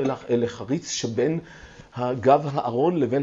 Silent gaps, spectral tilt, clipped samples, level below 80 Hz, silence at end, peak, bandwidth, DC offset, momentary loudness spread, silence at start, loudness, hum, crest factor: none; -5.5 dB/octave; under 0.1%; -58 dBFS; 0 s; -4 dBFS; 8 kHz; under 0.1%; 10 LU; 0 s; -24 LUFS; none; 20 dB